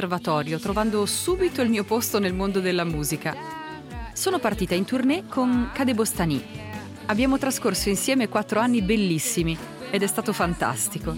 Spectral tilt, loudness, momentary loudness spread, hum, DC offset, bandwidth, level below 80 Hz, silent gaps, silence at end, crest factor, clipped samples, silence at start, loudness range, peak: -4.5 dB/octave; -24 LUFS; 9 LU; none; under 0.1%; 17 kHz; -42 dBFS; none; 0 s; 16 dB; under 0.1%; 0 s; 2 LU; -8 dBFS